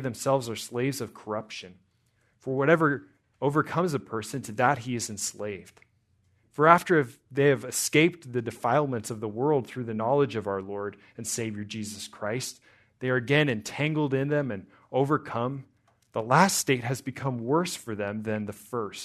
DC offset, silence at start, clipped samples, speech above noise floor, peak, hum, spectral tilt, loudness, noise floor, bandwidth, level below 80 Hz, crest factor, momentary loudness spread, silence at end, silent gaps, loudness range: under 0.1%; 0 s; under 0.1%; 42 dB; -2 dBFS; none; -5 dB/octave; -27 LUFS; -69 dBFS; 13.5 kHz; -70 dBFS; 26 dB; 13 LU; 0 s; none; 5 LU